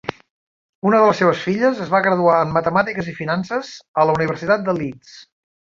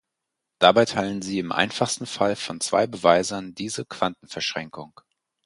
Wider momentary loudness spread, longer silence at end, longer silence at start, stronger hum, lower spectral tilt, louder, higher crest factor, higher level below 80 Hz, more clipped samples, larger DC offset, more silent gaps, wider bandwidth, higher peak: about the same, 11 LU vs 13 LU; about the same, 0.55 s vs 0.6 s; second, 0.1 s vs 0.6 s; neither; first, -6.5 dB/octave vs -3.5 dB/octave; first, -18 LUFS vs -23 LUFS; second, 16 dB vs 24 dB; first, -54 dBFS vs -60 dBFS; neither; neither; first, 0.30-0.82 s, 3.88-3.94 s vs none; second, 7.6 kHz vs 11.5 kHz; about the same, -2 dBFS vs 0 dBFS